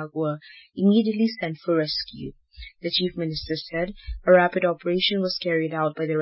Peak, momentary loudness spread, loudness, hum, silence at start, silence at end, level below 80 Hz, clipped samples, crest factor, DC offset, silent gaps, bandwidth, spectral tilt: -6 dBFS; 16 LU; -24 LUFS; none; 0 s; 0 s; -48 dBFS; under 0.1%; 18 dB; under 0.1%; none; 5.8 kHz; -9.5 dB/octave